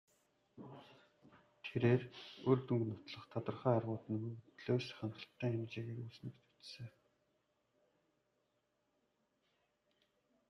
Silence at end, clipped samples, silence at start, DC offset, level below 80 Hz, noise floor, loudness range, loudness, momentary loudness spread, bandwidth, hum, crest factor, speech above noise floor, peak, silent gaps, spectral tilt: 3.6 s; under 0.1%; 0.55 s; under 0.1%; -80 dBFS; -83 dBFS; 17 LU; -40 LUFS; 21 LU; 6.6 kHz; none; 24 dB; 43 dB; -20 dBFS; none; -8 dB/octave